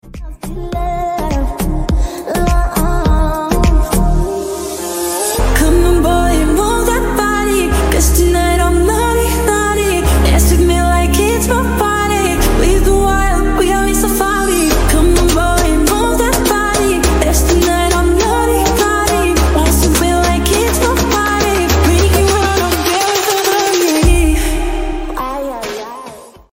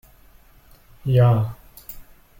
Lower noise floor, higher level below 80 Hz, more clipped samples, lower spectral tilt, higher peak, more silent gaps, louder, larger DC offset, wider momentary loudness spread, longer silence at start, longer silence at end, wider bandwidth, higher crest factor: second, -33 dBFS vs -51 dBFS; first, -16 dBFS vs -46 dBFS; neither; second, -4.5 dB/octave vs -9 dB/octave; first, 0 dBFS vs -6 dBFS; neither; first, -13 LUFS vs -20 LUFS; neither; second, 8 LU vs 24 LU; second, 0.05 s vs 1.05 s; second, 0.25 s vs 0.4 s; about the same, 16.5 kHz vs 17 kHz; second, 12 dB vs 18 dB